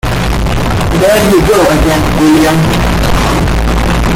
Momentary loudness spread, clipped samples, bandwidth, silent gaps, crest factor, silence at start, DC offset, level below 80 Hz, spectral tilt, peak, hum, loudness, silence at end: 6 LU; under 0.1%; 17 kHz; none; 8 dB; 0.05 s; under 0.1%; -16 dBFS; -5.5 dB/octave; 0 dBFS; none; -9 LUFS; 0 s